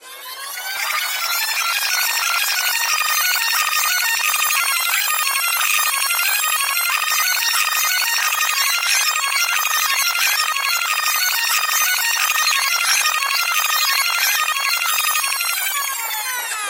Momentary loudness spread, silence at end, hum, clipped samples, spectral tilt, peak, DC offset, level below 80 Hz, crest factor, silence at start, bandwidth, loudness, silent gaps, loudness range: 4 LU; 0 s; none; under 0.1%; 6 dB/octave; -4 dBFS; under 0.1%; -74 dBFS; 16 dB; 0 s; 16 kHz; -16 LUFS; none; 1 LU